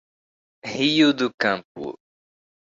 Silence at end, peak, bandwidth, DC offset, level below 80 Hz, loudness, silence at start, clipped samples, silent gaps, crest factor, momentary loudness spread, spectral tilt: 0.8 s; -6 dBFS; 7.6 kHz; under 0.1%; -66 dBFS; -21 LUFS; 0.65 s; under 0.1%; 1.34-1.38 s, 1.65-1.75 s; 18 dB; 18 LU; -4.5 dB/octave